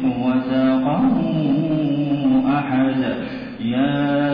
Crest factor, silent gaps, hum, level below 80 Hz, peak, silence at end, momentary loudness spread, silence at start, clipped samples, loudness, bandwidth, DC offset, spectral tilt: 10 dB; none; none; -48 dBFS; -10 dBFS; 0 s; 6 LU; 0 s; under 0.1%; -19 LUFS; 5.2 kHz; under 0.1%; -10 dB/octave